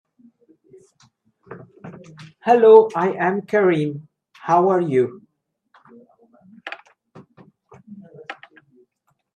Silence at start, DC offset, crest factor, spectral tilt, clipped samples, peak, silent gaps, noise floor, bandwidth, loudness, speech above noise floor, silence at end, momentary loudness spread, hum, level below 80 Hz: 1.5 s; under 0.1%; 22 dB; -7.5 dB/octave; under 0.1%; 0 dBFS; none; -70 dBFS; 7 kHz; -17 LUFS; 54 dB; 1 s; 29 LU; none; -74 dBFS